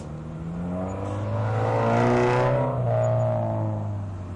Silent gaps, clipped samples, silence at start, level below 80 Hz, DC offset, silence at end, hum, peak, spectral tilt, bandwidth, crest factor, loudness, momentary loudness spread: none; under 0.1%; 0 s; -48 dBFS; under 0.1%; 0 s; none; -14 dBFS; -8 dB/octave; 9.2 kHz; 12 dB; -25 LUFS; 11 LU